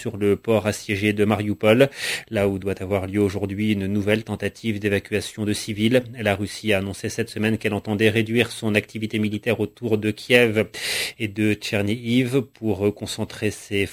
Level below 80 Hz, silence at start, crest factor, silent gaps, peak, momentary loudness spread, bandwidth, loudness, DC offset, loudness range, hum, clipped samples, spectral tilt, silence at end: -48 dBFS; 0 s; 22 dB; none; 0 dBFS; 8 LU; 16 kHz; -22 LUFS; under 0.1%; 2 LU; none; under 0.1%; -5.5 dB/octave; 0 s